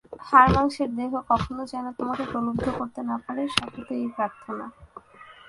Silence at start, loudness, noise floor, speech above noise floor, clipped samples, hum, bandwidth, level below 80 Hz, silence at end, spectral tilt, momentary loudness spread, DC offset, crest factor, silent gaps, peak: 0.1 s; -25 LUFS; -49 dBFS; 24 dB; under 0.1%; none; 11.5 kHz; -44 dBFS; 0 s; -5.5 dB/octave; 15 LU; under 0.1%; 24 dB; none; -2 dBFS